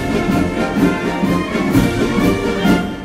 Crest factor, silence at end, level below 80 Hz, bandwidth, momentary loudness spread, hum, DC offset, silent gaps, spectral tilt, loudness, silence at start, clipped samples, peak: 14 dB; 0 s; -32 dBFS; 16 kHz; 2 LU; none; under 0.1%; none; -6.5 dB/octave; -16 LUFS; 0 s; under 0.1%; -2 dBFS